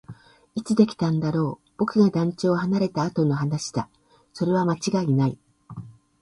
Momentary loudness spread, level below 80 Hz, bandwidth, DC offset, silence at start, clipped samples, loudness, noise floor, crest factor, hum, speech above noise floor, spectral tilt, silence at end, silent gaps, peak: 18 LU; -60 dBFS; 11.5 kHz; under 0.1%; 0.1 s; under 0.1%; -23 LUFS; -46 dBFS; 18 dB; none; 24 dB; -7 dB/octave; 0.3 s; none; -6 dBFS